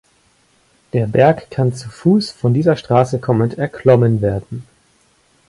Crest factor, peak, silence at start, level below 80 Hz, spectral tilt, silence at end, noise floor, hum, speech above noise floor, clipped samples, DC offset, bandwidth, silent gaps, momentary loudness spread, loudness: 16 dB; 0 dBFS; 0.95 s; -46 dBFS; -8 dB/octave; 0.85 s; -57 dBFS; none; 42 dB; under 0.1%; under 0.1%; 11.5 kHz; none; 8 LU; -16 LUFS